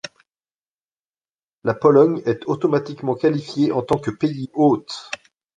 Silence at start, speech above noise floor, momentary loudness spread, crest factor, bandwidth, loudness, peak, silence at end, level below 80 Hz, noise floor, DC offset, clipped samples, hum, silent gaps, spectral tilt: 0.05 s; over 71 dB; 15 LU; 18 dB; 9.4 kHz; -20 LUFS; -2 dBFS; 0.4 s; -58 dBFS; under -90 dBFS; under 0.1%; under 0.1%; none; 0.55-0.62 s, 0.72-0.90 s, 1.00-1.05 s, 1.35-1.62 s; -7 dB/octave